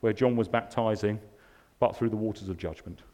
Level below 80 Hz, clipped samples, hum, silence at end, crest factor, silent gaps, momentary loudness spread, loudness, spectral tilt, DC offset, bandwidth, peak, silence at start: -56 dBFS; under 0.1%; none; 0.15 s; 20 dB; none; 12 LU; -30 LUFS; -7.5 dB/octave; under 0.1%; 13 kHz; -10 dBFS; 0.05 s